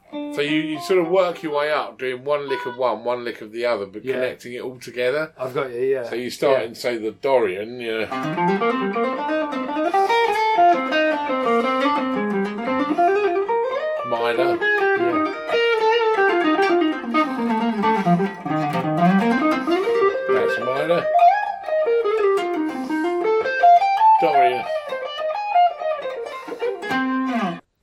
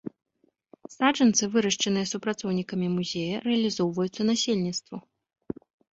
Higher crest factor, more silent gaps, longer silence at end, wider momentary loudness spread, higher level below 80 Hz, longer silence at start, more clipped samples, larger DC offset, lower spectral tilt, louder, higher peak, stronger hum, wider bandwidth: about the same, 16 dB vs 20 dB; neither; second, 0.2 s vs 0.95 s; second, 10 LU vs 18 LU; about the same, -66 dBFS vs -66 dBFS; second, 0.1 s vs 0.9 s; neither; neither; first, -6 dB/octave vs -4 dB/octave; first, -20 LUFS vs -26 LUFS; about the same, -4 dBFS vs -6 dBFS; neither; first, 14.5 kHz vs 8 kHz